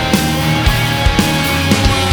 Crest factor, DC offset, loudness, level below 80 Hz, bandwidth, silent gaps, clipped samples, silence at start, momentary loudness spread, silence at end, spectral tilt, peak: 12 dB; under 0.1%; -13 LUFS; -22 dBFS; over 20 kHz; none; under 0.1%; 0 s; 1 LU; 0 s; -4.5 dB/octave; 0 dBFS